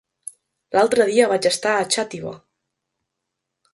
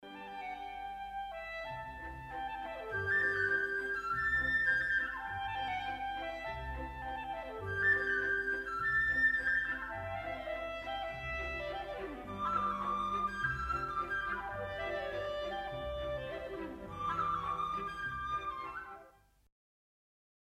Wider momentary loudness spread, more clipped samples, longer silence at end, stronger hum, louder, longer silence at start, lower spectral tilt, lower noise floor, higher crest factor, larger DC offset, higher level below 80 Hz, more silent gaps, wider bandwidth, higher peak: first, 21 LU vs 13 LU; neither; about the same, 1.4 s vs 1.4 s; neither; first, -19 LUFS vs -36 LUFS; first, 0.7 s vs 0 s; second, -2.5 dB/octave vs -5 dB/octave; first, -80 dBFS vs -62 dBFS; about the same, 20 dB vs 18 dB; neither; second, -66 dBFS vs -54 dBFS; neither; second, 12 kHz vs 15.5 kHz; first, -2 dBFS vs -20 dBFS